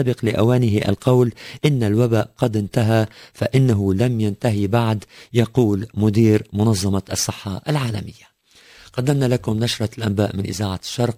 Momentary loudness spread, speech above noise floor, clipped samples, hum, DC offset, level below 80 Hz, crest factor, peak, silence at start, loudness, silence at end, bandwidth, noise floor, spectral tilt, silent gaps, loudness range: 7 LU; 31 dB; under 0.1%; none; under 0.1%; -42 dBFS; 16 dB; -2 dBFS; 0 s; -20 LUFS; 0 s; 16 kHz; -50 dBFS; -6.5 dB/octave; none; 4 LU